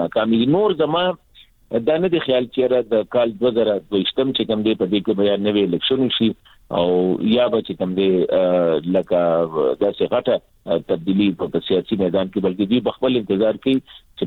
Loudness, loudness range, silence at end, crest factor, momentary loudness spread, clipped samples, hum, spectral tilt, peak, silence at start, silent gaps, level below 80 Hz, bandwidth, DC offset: -19 LUFS; 2 LU; 0 s; 14 dB; 5 LU; under 0.1%; none; -8.5 dB/octave; -4 dBFS; 0 s; none; -54 dBFS; 4.5 kHz; under 0.1%